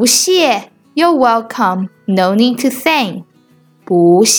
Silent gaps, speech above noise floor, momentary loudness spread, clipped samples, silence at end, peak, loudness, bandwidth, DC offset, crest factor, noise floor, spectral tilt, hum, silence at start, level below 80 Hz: none; 38 dB; 11 LU; under 0.1%; 0 s; 0 dBFS; -13 LUFS; over 20 kHz; under 0.1%; 12 dB; -49 dBFS; -3.5 dB/octave; none; 0 s; -64 dBFS